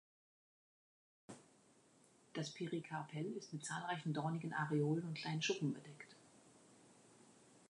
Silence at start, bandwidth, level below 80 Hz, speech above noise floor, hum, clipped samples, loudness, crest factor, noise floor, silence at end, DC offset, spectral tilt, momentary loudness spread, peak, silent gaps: 1.3 s; 11 kHz; -90 dBFS; 28 dB; none; under 0.1%; -43 LUFS; 18 dB; -71 dBFS; 0.1 s; under 0.1%; -5 dB/octave; 21 LU; -26 dBFS; none